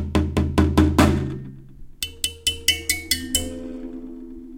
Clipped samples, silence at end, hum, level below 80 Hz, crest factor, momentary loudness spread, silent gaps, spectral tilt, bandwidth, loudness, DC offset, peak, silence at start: under 0.1%; 0 s; none; -34 dBFS; 20 dB; 18 LU; none; -4 dB/octave; 17 kHz; -21 LUFS; under 0.1%; -2 dBFS; 0 s